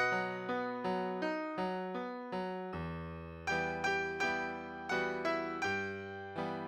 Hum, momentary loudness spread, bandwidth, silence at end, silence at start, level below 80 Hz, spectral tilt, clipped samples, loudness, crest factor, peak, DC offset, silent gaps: none; 8 LU; 15.5 kHz; 0 s; 0 s; -62 dBFS; -5 dB/octave; under 0.1%; -37 LUFS; 16 dB; -20 dBFS; under 0.1%; none